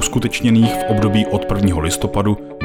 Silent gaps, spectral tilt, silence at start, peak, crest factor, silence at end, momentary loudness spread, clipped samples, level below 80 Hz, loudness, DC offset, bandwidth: none; -5.5 dB/octave; 0 s; -4 dBFS; 12 dB; 0 s; 5 LU; under 0.1%; -34 dBFS; -16 LUFS; under 0.1%; 18.5 kHz